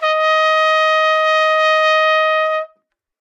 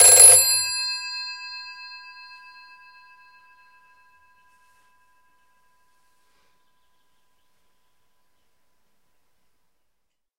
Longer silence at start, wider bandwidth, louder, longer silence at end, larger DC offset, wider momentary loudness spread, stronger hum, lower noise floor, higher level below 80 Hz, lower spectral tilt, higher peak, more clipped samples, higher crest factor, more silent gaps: about the same, 0 s vs 0 s; second, 9.2 kHz vs 16 kHz; about the same, -13 LUFS vs -13 LUFS; second, 0.55 s vs 8.65 s; neither; second, 5 LU vs 30 LU; neither; second, -62 dBFS vs -76 dBFS; second, under -90 dBFS vs -64 dBFS; second, 5.5 dB/octave vs 2.5 dB/octave; second, -4 dBFS vs 0 dBFS; neither; second, 12 dB vs 24 dB; neither